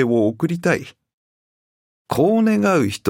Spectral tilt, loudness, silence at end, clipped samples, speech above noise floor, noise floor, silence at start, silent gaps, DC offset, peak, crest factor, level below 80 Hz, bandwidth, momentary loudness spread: -6.5 dB/octave; -18 LUFS; 0 s; under 0.1%; over 72 dB; under -90 dBFS; 0 s; 1.14-2.05 s; under 0.1%; -2 dBFS; 16 dB; -58 dBFS; 16.5 kHz; 6 LU